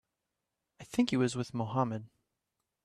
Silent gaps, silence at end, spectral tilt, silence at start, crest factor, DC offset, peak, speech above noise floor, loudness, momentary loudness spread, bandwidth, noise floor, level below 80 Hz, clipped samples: none; 0.8 s; -6 dB/octave; 0.8 s; 20 dB; under 0.1%; -16 dBFS; 55 dB; -33 LUFS; 7 LU; 13 kHz; -87 dBFS; -70 dBFS; under 0.1%